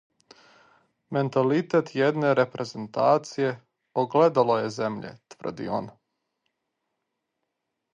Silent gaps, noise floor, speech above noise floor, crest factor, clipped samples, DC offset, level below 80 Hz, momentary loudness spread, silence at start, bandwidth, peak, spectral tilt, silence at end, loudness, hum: none; -81 dBFS; 57 dB; 20 dB; under 0.1%; under 0.1%; -70 dBFS; 15 LU; 1.1 s; 9 kHz; -8 dBFS; -6.5 dB/octave; 2.05 s; -25 LUFS; none